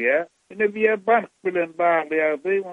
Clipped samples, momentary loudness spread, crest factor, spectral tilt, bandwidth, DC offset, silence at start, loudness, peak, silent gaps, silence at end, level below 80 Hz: under 0.1%; 5 LU; 16 dB; -7 dB/octave; 8 kHz; under 0.1%; 0 s; -22 LUFS; -6 dBFS; none; 0 s; -74 dBFS